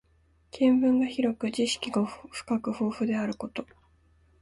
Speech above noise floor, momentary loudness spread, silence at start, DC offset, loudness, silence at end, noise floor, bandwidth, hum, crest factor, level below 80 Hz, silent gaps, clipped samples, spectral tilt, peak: 37 dB; 14 LU; 0.55 s; under 0.1%; -28 LUFS; 0.75 s; -65 dBFS; 11.5 kHz; none; 16 dB; -62 dBFS; none; under 0.1%; -5 dB/octave; -12 dBFS